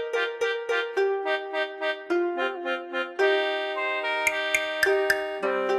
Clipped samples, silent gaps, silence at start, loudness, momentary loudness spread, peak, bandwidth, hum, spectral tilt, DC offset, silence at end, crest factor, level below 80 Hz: under 0.1%; none; 0 s; -26 LUFS; 6 LU; -8 dBFS; 13 kHz; none; -1.5 dB/octave; under 0.1%; 0 s; 18 dB; -66 dBFS